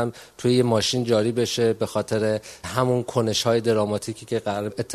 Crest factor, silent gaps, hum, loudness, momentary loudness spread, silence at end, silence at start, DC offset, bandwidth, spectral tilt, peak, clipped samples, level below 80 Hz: 18 dB; none; none; -23 LUFS; 8 LU; 0 s; 0 s; under 0.1%; 13.5 kHz; -5 dB/octave; -6 dBFS; under 0.1%; -56 dBFS